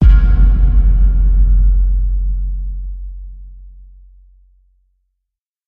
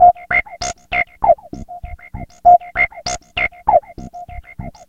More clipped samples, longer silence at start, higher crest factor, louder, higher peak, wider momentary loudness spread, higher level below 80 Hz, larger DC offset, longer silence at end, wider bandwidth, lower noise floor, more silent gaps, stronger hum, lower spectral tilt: neither; about the same, 0 s vs 0 s; about the same, 12 dB vs 16 dB; about the same, -15 LUFS vs -16 LUFS; about the same, 0 dBFS vs 0 dBFS; second, 19 LU vs 22 LU; first, -12 dBFS vs -38 dBFS; second, under 0.1% vs 0.2%; first, 2 s vs 0.2 s; second, 2.4 kHz vs 9 kHz; first, -78 dBFS vs -33 dBFS; neither; neither; first, -10.5 dB/octave vs -3 dB/octave